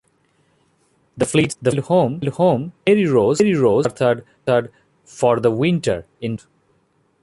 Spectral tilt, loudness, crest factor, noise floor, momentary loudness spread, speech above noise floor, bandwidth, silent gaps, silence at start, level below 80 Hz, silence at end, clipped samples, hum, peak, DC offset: -6 dB/octave; -18 LUFS; 16 dB; -62 dBFS; 10 LU; 45 dB; 11.5 kHz; none; 1.15 s; -54 dBFS; 0.85 s; under 0.1%; none; -2 dBFS; under 0.1%